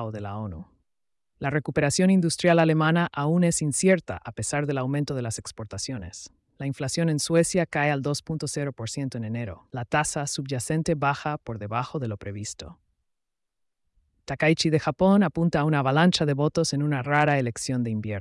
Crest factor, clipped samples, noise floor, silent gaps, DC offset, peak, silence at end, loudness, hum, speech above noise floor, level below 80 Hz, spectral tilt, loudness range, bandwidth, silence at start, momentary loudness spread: 16 dB; under 0.1%; -87 dBFS; none; under 0.1%; -10 dBFS; 0 s; -25 LUFS; none; 63 dB; -56 dBFS; -5 dB/octave; 7 LU; 12 kHz; 0 s; 14 LU